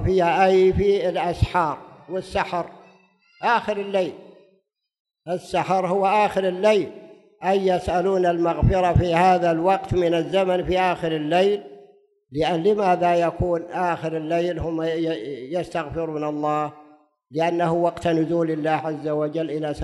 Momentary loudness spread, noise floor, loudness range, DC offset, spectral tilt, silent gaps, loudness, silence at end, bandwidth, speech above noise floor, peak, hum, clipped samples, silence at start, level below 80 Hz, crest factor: 10 LU; -66 dBFS; 6 LU; under 0.1%; -7 dB/octave; 5.00-5.05 s; -22 LUFS; 0 s; 12 kHz; 45 dB; -4 dBFS; none; under 0.1%; 0 s; -40 dBFS; 18 dB